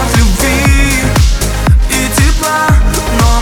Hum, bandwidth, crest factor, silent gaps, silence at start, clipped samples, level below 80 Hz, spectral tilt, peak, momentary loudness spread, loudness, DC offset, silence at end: none; 19 kHz; 8 dB; none; 0 s; under 0.1%; -12 dBFS; -4.5 dB/octave; 0 dBFS; 2 LU; -10 LUFS; under 0.1%; 0 s